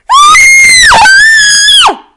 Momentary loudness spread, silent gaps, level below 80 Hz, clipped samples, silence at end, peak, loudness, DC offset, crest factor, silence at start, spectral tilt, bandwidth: 3 LU; none; -32 dBFS; 10%; 0.2 s; 0 dBFS; 0 LUFS; under 0.1%; 2 dB; 0.1 s; 1.5 dB/octave; 12 kHz